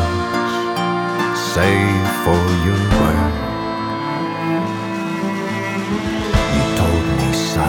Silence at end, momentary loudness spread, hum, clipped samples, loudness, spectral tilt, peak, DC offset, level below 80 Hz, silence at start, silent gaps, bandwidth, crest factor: 0 s; 7 LU; none; under 0.1%; -18 LUFS; -5.5 dB/octave; -2 dBFS; under 0.1%; -30 dBFS; 0 s; none; 19 kHz; 16 dB